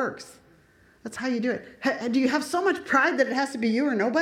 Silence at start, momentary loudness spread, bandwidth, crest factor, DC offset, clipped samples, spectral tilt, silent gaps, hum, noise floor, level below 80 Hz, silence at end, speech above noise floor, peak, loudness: 0 s; 14 LU; 15 kHz; 18 dB; under 0.1%; under 0.1%; -4.5 dB/octave; none; none; -58 dBFS; -68 dBFS; 0 s; 33 dB; -8 dBFS; -25 LUFS